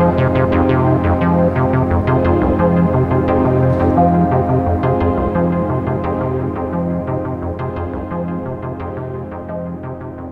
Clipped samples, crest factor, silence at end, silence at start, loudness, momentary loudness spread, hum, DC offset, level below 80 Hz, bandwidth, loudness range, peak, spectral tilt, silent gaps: under 0.1%; 14 dB; 0 s; 0 s; -16 LUFS; 12 LU; none; under 0.1%; -30 dBFS; 4.8 kHz; 8 LU; -2 dBFS; -10.5 dB/octave; none